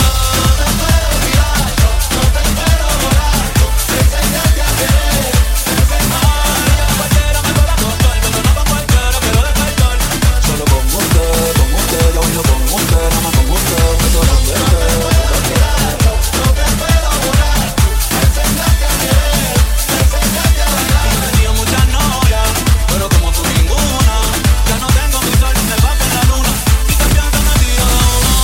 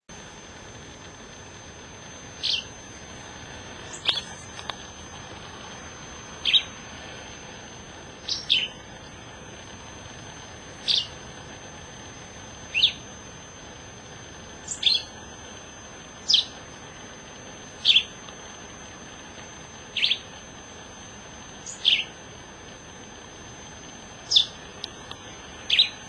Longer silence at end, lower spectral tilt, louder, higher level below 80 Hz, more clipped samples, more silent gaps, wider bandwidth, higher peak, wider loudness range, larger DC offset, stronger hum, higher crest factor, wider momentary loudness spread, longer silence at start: about the same, 0 s vs 0 s; first, -4 dB/octave vs -1 dB/octave; first, -12 LUFS vs -23 LUFS; first, -14 dBFS vs -54 dBFS; neither; neither; first, 17 kHz vs 11 kHz; about the same, 0 dBFS vs -2 dBFS; second, 1 LU vs 7 LU; neither; neither; second, 10 dB vs 28 dB; second, 1 LU vs 21 LU; about the same, 0 s vs 0.1 s